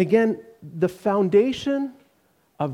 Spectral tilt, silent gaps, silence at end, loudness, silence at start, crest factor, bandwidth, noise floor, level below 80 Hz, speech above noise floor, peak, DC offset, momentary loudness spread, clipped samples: -7 dB/octave; none; 0 s; -23 LUFS; 0 s; 16 dB; 12.5 kHz; -64 dBFS; -60 dBFS; 43 dB; -6 dBFS; under 0.1%; 14 LU; under 0.1%